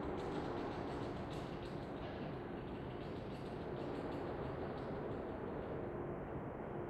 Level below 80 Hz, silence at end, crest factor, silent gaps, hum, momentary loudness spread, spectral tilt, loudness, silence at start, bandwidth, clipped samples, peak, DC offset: -58 dBFS; 0 s; 14 dB; none; none; 4 LU; -8 dB/octave; -45 LUFS; 0 s; 12.5 kHz; under 0.1%; -30 dBFS; under 0.1%